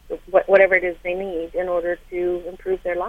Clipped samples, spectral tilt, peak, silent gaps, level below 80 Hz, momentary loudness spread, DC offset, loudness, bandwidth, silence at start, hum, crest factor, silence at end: under 0.1%; -6.5 dB/octave; -2 dBFS; none; -46 dBFS; 12 LU; under 0.1%; -21 LUFS; 5 kHz; 0.05 s; none; 20 dB; 0 s